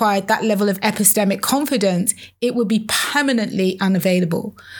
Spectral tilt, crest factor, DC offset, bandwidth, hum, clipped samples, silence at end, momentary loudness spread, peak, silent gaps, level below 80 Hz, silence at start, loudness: -4 dB/octave; 18 dB; under 0.1%; over 20 kHz; none; under 0.1%; 0 s; 7 LU; 0 dBFS; none; -62 dBFS; 0 s; -18 LUFS